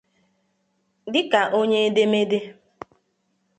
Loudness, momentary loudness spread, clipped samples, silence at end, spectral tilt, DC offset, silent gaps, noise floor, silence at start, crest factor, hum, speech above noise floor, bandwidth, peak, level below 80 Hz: -21 LUFS; 12 LU; under 0.1%; 1.05 s; -5 dB/octave; under 0.1%; none; -70 dBFS; 1.05 s; 20 dB; none; 50 dB; 8.8 kHz; -4 dBFS; -72 dBFS